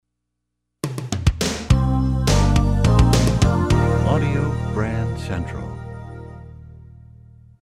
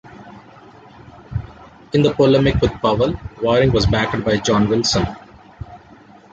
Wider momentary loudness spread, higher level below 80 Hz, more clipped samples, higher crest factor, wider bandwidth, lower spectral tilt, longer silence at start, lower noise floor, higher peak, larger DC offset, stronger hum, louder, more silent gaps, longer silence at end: second, 18 LU vs 23 LU; first, -26 dBFS vs -34 dBFS; neither; about the same, 18 dB vs 16 dB; first, 15 kHz vs 9 kHz; about the same, -6 dB/octave vs -5.5 dB/octave; first, 0.85 s vs 0.05 s; first, -78 dBFS vs -45 dBFS; about the same, 0 dBFS vs -2 dBFS; neither; first, 60 Hz at -45 dBFS vs none; about the same, -19 LUFS vs -17 LUFS; neither; first, 0.75 s vs 0.55 s